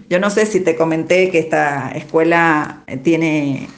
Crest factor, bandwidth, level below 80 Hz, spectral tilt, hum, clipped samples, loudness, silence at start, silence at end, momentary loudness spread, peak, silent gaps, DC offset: 16 dB; 9.6 kHz; -58 dBFS; -5.5 dB/octave; none; under 0.1%; -15 LUFS; 0 s; 0.05 s; 6 LU; 0 dBFS; none; under 0.1%